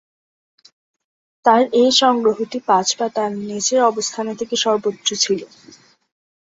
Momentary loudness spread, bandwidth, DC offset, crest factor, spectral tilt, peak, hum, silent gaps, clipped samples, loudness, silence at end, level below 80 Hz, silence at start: 10 LU; 8 kHz; under 0.1%; 18 dB; -2.5 dB/octave; -2 dBFS; none; none; under 0.1%; -17 LUFS; 1 s; -66 dBFS; 1.45 s